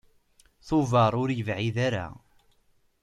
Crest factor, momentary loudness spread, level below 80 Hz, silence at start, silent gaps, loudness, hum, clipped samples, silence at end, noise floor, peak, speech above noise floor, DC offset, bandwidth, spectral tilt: 18 dB; 8 LU; -56 dBFS; 0.65 s; none; -26 LUFS; none; under 0.1%; 0.9 s; -66 dBFS; -10 dBFS; 40 dB; under 0.1%; 10.5 kHz; -7 dB/octave